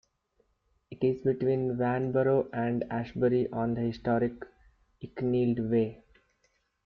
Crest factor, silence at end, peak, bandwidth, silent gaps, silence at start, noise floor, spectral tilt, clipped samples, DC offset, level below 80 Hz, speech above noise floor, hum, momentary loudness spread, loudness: 14 dB; 0.9 s; -16 dBFS; 5.8 kHz; none; 0.9 s; -73 dBFS; -10 dB/octave; under 0.1%; under 0.1%; -60 dBFS; 45 dB; none; 7 LU; -29 LUFS